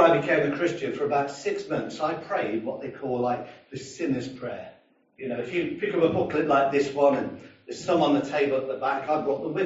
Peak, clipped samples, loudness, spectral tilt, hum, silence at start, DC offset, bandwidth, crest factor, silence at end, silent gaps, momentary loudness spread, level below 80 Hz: -6 dBFS; under 0.1%; -26 LUFS; -4.5 dB/octave; none; 0 s; under 0.1%; 8 kHz; 20 dB; 0 s; none; 14 LU; -66 dBFS